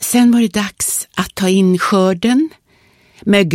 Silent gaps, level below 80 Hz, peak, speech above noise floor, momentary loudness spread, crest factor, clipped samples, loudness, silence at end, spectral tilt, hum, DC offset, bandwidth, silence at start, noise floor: none; -50 dBFS; 0 dBFS; 39 dB; 8 LU; 14 dB; under 0.1%; -14 LUFS; 0 s; -4.5 dB/octave; none; under 0.1%; 16.5 kHz; 0 s; -52 dBFS